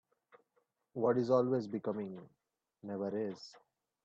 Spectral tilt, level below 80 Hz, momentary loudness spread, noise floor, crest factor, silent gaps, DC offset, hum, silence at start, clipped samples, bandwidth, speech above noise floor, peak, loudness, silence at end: -8 dB/octave; -82 dBFS; 21 LU; -80 dBFS; 20 dB; none; under 0.1%; none; 0.95 s; under 0.1%; 7.6 kHz; 45 dB; -18 dBFS; -36 LUFS; 0.45 s